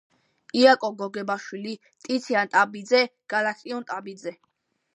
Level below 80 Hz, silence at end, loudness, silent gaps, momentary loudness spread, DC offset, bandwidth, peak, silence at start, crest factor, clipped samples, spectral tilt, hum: -80 dBFS; 0.6 s; -24 LUFS; none; 18 LU; under 0.1%; 10 kHz; -4 dBFS; 0.55 s; 22 dB; under 0.1%; -4 dB/octave; none